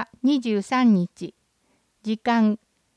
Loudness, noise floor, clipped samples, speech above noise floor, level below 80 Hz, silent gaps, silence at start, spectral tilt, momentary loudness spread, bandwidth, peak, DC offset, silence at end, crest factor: -22 LUFS; -67 dBFS; under 0.1%; 46 dB; -70 dBFS; none; 0 s; -6.5 dB/octave; 16 LU; 10 kHz; -10 dBFS; under 0.1%; 0.4 s; 14 dB